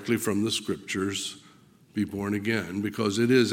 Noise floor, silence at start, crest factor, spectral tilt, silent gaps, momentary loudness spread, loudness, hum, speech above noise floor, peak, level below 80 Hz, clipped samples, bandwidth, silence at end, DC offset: -56 dBFS; 0 s; 18 dB; -4.5 dB/octave; none; 9 LU; -28 LUFS; none; 29 dB; -8 dBFS; -66 dBFS; under 0.1%; 17.5 kHz; 0 s; under 0.1%